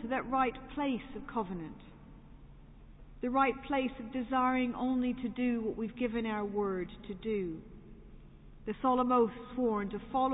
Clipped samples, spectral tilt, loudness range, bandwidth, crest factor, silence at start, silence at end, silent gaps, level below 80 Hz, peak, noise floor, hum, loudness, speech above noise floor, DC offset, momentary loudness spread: under 0.1%; -2.5 dB/octave; 5 LU; 3.9 kHz; 18 dB; 0 s; 0 s; none; -56 dBFS; -16 dBFS; -53 dBFS; none; -34 LUFS; 20 dB; under 0.1%; 13 LU